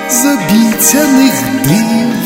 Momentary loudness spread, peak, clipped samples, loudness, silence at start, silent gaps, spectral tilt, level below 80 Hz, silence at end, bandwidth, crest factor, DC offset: 4 LU; 0 dBFS; 0.4%; -9 LUFS; 0 s; none; -3.5 dB/octave; -42 dBFS; 0 s; over 20 kHz; 10 dB; under 0.1%